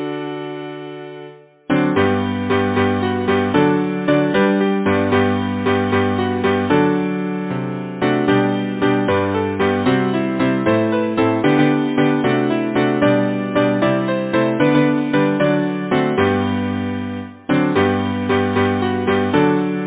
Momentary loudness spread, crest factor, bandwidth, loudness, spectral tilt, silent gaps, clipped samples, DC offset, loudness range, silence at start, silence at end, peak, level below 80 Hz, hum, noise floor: 7 LU; 16 dB; 4 kHz; -17 LUFS; -11 dB/octave; none; under 0.1%; under 0.1%; 2 LU; 0 s; 0 s; 0 dBFS; -44 dBFS; none; -39 dBFS